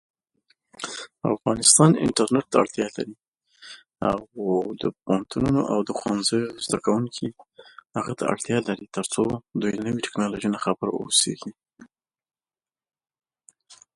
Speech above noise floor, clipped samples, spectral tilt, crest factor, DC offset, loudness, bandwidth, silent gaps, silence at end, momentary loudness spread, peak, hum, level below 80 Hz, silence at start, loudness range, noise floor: over 66 dB; under 0.1%; -4 dB/octave; 24 dB; under 0.1%; -23 LUFS; 11.5 kHz; 3.28-3.32 s; 0.2 s; 15 LU; -2 dBFS; none; -56 dBFS; 0.8 s; 6 LU; under -90 dBFS